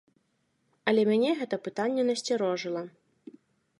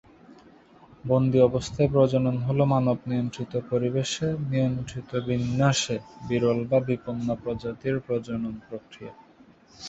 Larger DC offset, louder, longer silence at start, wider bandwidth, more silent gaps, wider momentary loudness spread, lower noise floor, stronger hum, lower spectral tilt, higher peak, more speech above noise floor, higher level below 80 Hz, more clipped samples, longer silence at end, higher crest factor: neither; about the same, -28 LUFS vs -26 LUFS; first, 0.85 s vs 0.3 s; first, 11.5 kHz vs 8.2 kHz; neither; about the same, 10 LU vs 12 LU; first, -74 dBFS vs -55 dBFS; neither; second, -5 dB/octave vs -6.5 dB/octave; second, -12 dBFS vs -6 dBFS; first, 46 dB vs 29 dB; second, -82 dBFS vs -52 dBFS; neither; first, 0.9 s vs 0 s; about the same, 18 dB vs 20 dB